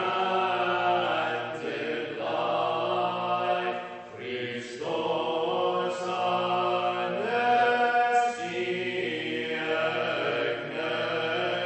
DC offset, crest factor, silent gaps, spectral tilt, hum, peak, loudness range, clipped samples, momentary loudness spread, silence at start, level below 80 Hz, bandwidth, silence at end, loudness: under 0.1%; 16 dB; none; -4.5 dB/octave; none; -12 dBFS; 4 LU; under 0.1%; 9 LU; 0 s; -72 dBFS; 8.4 kHz; 0 s; -28 LUFS